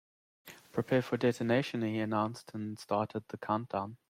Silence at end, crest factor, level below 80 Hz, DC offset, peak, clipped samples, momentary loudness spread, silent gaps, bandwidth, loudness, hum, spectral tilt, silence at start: 0.15 s; 18 dB; -72 dBFS; under 0.1%; -16 dBFS; under 0.1%; 11 LU; none; 16 kHz; -34 LUFS; none; -6.5 dB/octave; 0.45 s